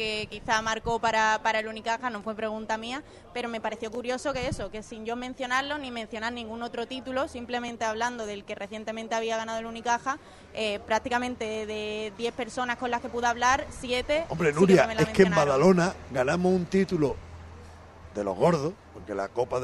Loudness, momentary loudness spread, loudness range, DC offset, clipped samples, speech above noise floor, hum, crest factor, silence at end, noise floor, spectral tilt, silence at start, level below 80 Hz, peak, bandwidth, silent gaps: -28 LUFS; 14 LU; 9 LU; under 0.1%; under 0.1%; 19 dB; none; 22 dB; 0 s; -47 dBFS; -5 dB/octave; 0 s; -52 dBFS; -6 dBFS; 12 kHz; none